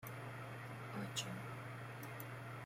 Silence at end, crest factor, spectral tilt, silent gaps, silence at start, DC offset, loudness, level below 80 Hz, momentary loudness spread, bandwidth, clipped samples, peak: 0 s; 20 dB; -4 dB/octave; none; 0 s; under 0.1%; -48 LUFS; -74 dBFS; 6 LU; 16.5 kHz; under 0.1%; -28 dBFS